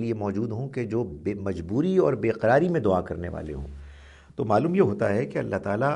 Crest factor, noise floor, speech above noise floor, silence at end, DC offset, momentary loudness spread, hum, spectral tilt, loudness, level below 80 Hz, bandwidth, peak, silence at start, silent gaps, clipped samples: 18 dB; -48 dBFS; 23 dB; 0 s; under 0.1%; 13 LU; none; -8.5 dB/octave; -25 LUFS; -48 dBFS; 10.5 kHz; -8 dBFS; 0 s; none; under 0.1%